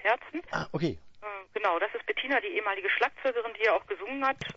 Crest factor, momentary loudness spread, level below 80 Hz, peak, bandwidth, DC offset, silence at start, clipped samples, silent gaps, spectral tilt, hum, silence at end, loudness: 18 dB; 9 LU; -62 dBFS; -12 dBFS; 7.8 kHz; under 0.1%; 0 s; under 0.1%; none; -5.5 dB/octave; none; 0.05 s; -30 LUFS